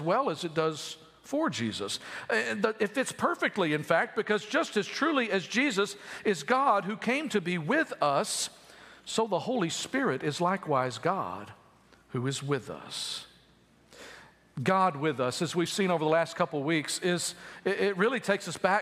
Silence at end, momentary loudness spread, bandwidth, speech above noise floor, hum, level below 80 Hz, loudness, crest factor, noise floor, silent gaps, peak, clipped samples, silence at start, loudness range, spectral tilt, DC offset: 0 s; 9 LU; 15.5 kHz; 32 dB; none; -74 dBFS; -29 LUFS; 22 dB; -62 dBFS; none; -8 dBFS; under 0.1%; 0 s; 4 LU; -4 dB/octave; under 0.1%